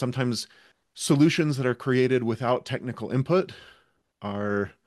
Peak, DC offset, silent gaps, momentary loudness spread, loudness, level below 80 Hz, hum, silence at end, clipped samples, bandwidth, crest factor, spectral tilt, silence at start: -8 dBFS; under 0.1%; none; 12 LU; -25 LUFS; -68 dBFS; none; 0.15 s; under 0.1%; 12.5 kHz; 18 dB; -6 dB/octave; 0 s